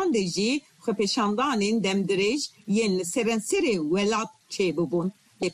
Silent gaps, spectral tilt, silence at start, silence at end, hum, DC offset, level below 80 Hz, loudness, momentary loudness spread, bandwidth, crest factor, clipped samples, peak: none; -4.5 dB/octave; 0 s; 0 s; none; under 0.1%; -64 dBFS; -26 LUFS; 5 LU; 14 kHz; 12 dB; under 0.1%; -14 dBFS